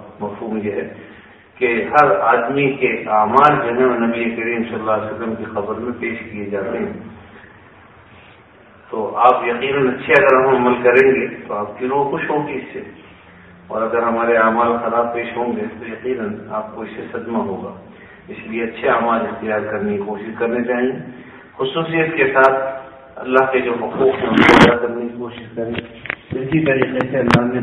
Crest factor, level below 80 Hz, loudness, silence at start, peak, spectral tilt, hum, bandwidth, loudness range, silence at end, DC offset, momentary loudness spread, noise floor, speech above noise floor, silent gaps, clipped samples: 18 dB; -50 dBFS; -17 LUFS; 0 s; 0 dBFS; -6.5 dB/octave; none; 12 kHz; 9 LU; 0 s; under 0.1%; 15 LU; -45 dBFS; 29 dB; none; under 0.1%